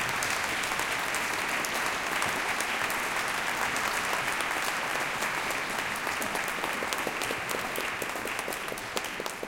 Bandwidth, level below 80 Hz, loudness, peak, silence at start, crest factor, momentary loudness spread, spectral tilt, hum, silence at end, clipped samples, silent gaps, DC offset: 17 kHz; -58 dBFS; -29 LUFS; -6 dBFS; 0 s; 26 dB; 4 LU; -1.5 dB/octave; none; 0 s; under 0.1%; none; under 0.1%